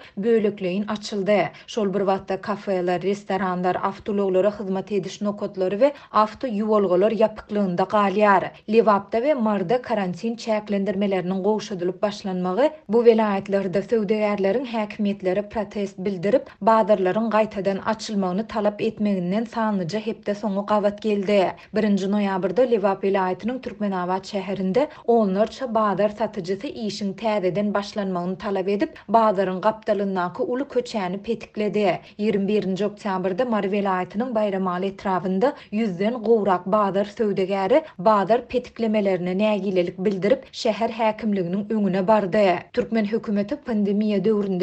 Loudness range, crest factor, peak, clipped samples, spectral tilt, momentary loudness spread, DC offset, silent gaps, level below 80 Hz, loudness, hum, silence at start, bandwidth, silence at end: 3 LU; 18 dB; -4 dBFS; under 0.1%; -7 dB/octave; 7 LU; under 0.1%; none; -60 dBFS; -23 LUFS; none; 0 s; 8.4 kHz; 0 s